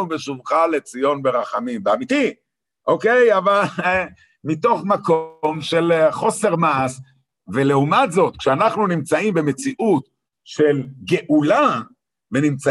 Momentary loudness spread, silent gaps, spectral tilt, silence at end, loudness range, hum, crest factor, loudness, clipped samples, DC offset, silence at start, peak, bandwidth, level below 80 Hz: 9 LU; none; -5.5 dB/octave; 0 s; 1 LU; none; 16 dB; -19 LUFS; under 0.1%; under 0.1%; 0 s; -4 dBFS; 12.5 kHz; -58 dBFS